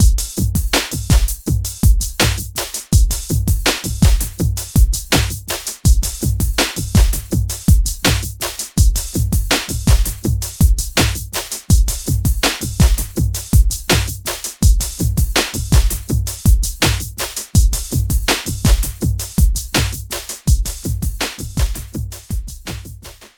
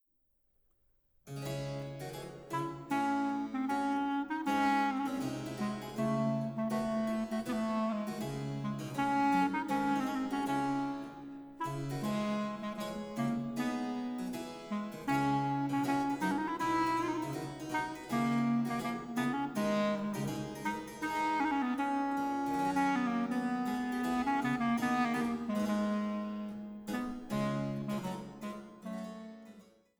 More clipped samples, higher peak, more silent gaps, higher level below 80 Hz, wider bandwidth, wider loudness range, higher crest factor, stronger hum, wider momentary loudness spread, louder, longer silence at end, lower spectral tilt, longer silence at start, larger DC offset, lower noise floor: neither; first, 0 dBFS vs -20 dBFS; neither; first, -18 dBFS vs -64 dBFS; about the same, 19.5 kHz vs over 20 kHz; about the same, 2 LU vs 4 LU; about the same, 16 dB vs 16 dB; neither; second, 7 LU vs 10 LU; first, -18 LUFS vs -35 LUFS; second, 0.1 s vs 0.35 s; second, -4 dB/octave vs -6 dB/octave; second, 0 s vs 1.25 s; neither; second, -36 dBFS vs -76 dBFS